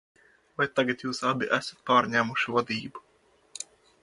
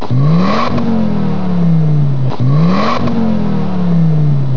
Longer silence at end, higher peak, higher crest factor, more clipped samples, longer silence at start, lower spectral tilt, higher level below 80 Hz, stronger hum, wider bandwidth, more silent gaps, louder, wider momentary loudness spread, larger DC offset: first, 0.4 s vs 0 s; second, -8 dBFS vs 0 dBFS; first, 22 dB vs 10 dB; neither; first, 0.6 s vs 0 s; second, -4 dB/octave vs -9 dB/octave; second, -70 dBFS vs -42 dBFS; neither; first, 11.5 kHz vs 6 kHz; neither; second, -27 LUFS vs -13 LUFS; first, 18 LU vs 4 LU; second, under 0.1% vs 20%